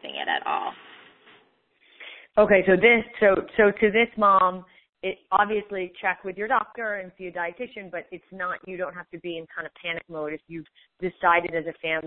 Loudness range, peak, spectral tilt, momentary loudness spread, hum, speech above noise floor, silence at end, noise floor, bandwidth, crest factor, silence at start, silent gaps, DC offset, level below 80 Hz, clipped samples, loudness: 13 LU; -4 dBFS; -9.5 dB/octave; 18 LU; none; 39 dB; 0 s; -63 dBFS; 4.2 kHz; 22 dB; 0 s; 4.89-4.93 s; under 0.1%; -58 dBFS; under 0.1%; -24 LUFS